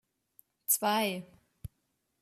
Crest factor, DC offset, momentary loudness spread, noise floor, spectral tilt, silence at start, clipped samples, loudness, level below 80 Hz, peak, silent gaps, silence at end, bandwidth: 22 dB; under 0.1%; 24 LU; -79 dBFS; -2.5 dB/octave; 0.7 s; under 0.1%; -30 LUFS; -64 dBFS; -14 dBFS; none; 0.55 s; 14.5 kHz